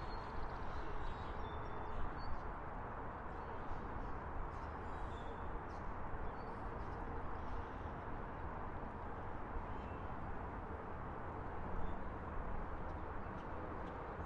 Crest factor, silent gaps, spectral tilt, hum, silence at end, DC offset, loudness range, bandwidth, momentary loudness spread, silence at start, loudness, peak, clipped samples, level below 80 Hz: 16 dB; none; -8 dB/octave; none; 0 s; under 0.1%; 0 LU; 6.2 kHz; 1 LU; 0 s; -48 LUFS; -28 dBFS; under 0.1%; -50 dBFS